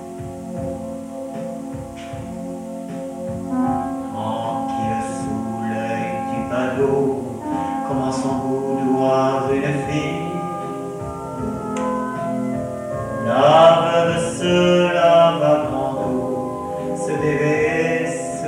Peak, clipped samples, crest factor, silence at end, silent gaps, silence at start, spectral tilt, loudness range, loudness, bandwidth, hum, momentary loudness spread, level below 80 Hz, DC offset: -2 dBFS; under 0.1%; 18 dB; 0 s; none; 0 s; -6 dB/octave; 11 LU; -20 LUFS; 15.5 kHz; none; 15 LU; -48 dBFS; under 0.1%